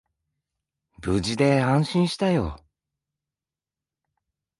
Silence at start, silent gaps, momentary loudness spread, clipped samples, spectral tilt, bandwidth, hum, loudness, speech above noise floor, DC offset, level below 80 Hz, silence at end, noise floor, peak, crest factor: 1 s; none; 9 LU; under 0.1%; -6.5 dB/octave; 11.5 kHz; none; -23 LUFS; over 68 dB; under 0.1%; -46 dBFS; 2.05 s; under -90 dBFS; -6 dBFS; 20 dB